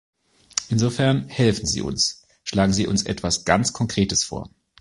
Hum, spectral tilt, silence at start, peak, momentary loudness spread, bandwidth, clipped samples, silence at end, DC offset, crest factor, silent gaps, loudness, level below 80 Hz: none; -4 dB/octave; 0.55 s; -2 dBFS; 8 LU; 11.5 kHz; under 0.1%; 0.35 s; under 0.1%; 22 dB; none; -22 LUFS; -44 dBFS